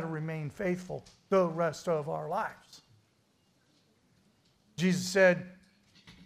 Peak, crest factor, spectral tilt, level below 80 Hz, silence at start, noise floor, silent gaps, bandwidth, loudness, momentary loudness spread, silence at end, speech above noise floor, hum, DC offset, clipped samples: -14 dBFS; 20 dB; -5.5 dB/octave; -70 dBFS; 0 s; -70 dBFS; none; 15.5 kHz; -31 LUFS; 19 LU; 0.15 s; 40 dB; none; under 0.1%; under 0.1%